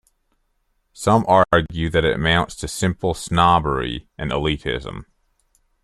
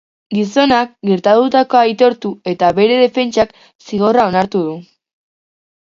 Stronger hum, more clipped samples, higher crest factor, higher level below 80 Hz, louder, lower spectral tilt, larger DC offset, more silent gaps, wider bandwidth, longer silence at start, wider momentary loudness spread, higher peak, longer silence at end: neither; neither; first, 20 dB vs 14 dB; first, -38 dBFS vs -52 dBFS; second, -19 LUFS vs -14 LUFS; about the same, -5 dB/octave vs -6 dB/octave; neither; second, none vs 3.75-3.79 s; first, 13.5 kHz vs 7.6 kHz; first, 0.95 s vs 0.3 s; first, 13 LU vs 10 LU; about the same, -2 dBFS vs 0 dBFS; second, 0.8 s vs 1.05 s